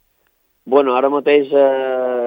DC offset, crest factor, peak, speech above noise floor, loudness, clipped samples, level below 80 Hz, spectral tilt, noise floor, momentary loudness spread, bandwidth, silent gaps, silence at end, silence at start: under 0.1%; 16 dB; 0 dBFS; 48 dB; -15 LUFS; under 0.1%; -72 dBFS; -7 dB/octave; -63 dBFS; 5 LU; 4.8 kHz; none; 0 s; 0.65 s